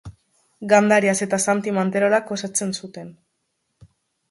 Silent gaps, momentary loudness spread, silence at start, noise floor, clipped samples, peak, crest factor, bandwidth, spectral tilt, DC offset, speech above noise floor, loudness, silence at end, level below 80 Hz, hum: none; 17 LU; 0.05 s; -74 dBFS; under 0.1%; -2 dBFS; 20 dB; 11.5 kHz; -4 dB/octave; under 0.1%; 54 dB; -20 LUFS; 1.2 s; -60 dBFS; none